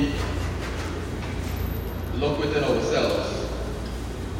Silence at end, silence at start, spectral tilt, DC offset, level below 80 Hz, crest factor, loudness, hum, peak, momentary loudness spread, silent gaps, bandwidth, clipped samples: 0 s; 0 s; -6 dB/octave; under 0.1%; -34 dBFS; 16 dB; -27 LUFS; none; -10 dBFS; 8 LU; none; 16 kHz; under 0.1%